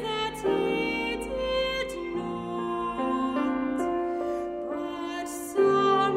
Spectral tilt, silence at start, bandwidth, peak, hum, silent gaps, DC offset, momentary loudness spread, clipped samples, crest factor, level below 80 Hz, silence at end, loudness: -4.5 dB/octave; 0 s; 16 kHz; -12 dBFS; none; none; under 0.1%; 9 LU; under 0.1%; 16 dB; -52 dBFS; 0 s; -28 LUFS